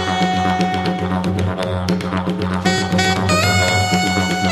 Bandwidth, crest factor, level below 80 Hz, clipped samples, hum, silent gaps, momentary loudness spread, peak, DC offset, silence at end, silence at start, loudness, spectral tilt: 15.5 kHz; 16 dB; -44 dBFS; under 0.1%; none; none; 6 LU; -2 dBFS; under 0.1%; 0 s; 0 s; -17 LUFS; -4.5 dB/octave